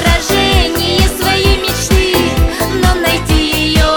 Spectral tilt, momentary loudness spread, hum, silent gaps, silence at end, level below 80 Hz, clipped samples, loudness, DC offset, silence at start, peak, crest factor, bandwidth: -4 dB/octave; 3 LU; none; none; 0 s; -16 dBFS; under 0.1%; -12 LUFS; under 0.1%; 0 s; 0 dBFS; 12 dB; over 20 kHz